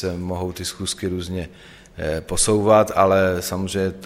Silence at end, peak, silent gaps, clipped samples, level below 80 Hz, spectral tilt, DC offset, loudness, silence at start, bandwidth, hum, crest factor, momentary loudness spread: 0 s; -2 dBFS; none; under 0.1%; -42 dBFS; -4.5 dB/octave; under 0.1%; -21 LUFS; 0 s; 16 kHz; none; 18 dB; 13 LU